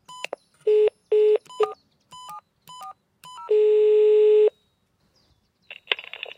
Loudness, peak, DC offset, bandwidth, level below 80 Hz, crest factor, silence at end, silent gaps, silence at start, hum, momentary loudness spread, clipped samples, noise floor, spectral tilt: -20 LUFS; -2 dBFS; under 0.1%; 9.6 kHz; -74 dBFS; 20 dB; 0.45 s; none; 0.1 s; none; 24 LU; under 0.1%; -68 dBFS; -2.5 dB/octave